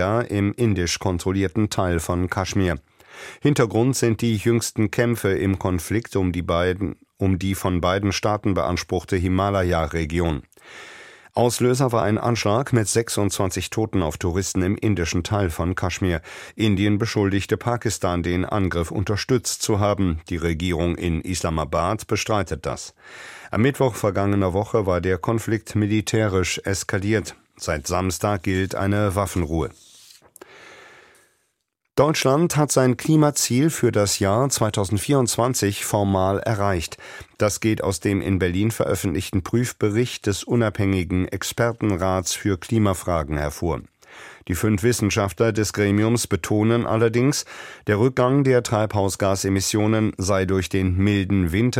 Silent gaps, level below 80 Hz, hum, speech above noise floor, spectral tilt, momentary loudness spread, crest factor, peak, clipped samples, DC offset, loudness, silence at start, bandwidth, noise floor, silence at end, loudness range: none; -42 dBFS; none; 54 dB; -5.5 dB/octave; 6 LU; 18 dB; -4 dBFS; under 0.1%; under 0.1%; -22 LUFS; 0 s; 16.5 kHz; -75 dBFS; 0 s; 4 LU